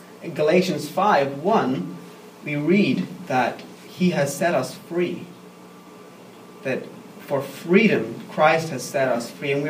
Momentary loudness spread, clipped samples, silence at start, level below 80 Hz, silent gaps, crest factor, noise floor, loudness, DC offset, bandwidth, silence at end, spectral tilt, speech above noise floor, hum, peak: 16 LU; under 0.1%; 0 s; -70 dBFS; none; 20 dB; -44 dBFS; -22 LUFS; under 0.1%; 15.5 kHz; 0 s; -5.5 dB/octave; 22 dB; none; -2 dBFS